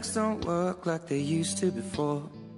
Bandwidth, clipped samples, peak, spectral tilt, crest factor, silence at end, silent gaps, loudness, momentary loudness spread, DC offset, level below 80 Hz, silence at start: 11.5 kHz; under 0.1%; -14 dBFS; -5 dB/octave; 16 dB; 0 s; none; -30 LUFS; 3 LU; under 0.1%; -60 dBFS; 0 s